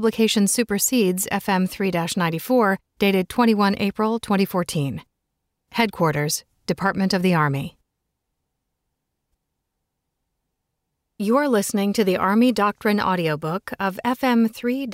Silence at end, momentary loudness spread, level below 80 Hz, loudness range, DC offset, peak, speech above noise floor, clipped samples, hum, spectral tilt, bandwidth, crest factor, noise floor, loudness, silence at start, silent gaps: 0 s; 8 LU; -56 dBFS; 6 LU; under 0.1%; -4 dBFS; 58 dB; under 0.1%; none; -4.5 dB/octave; 16 kHz; 18 dB; -78 dBFS; -21 LUFS; 0 s; none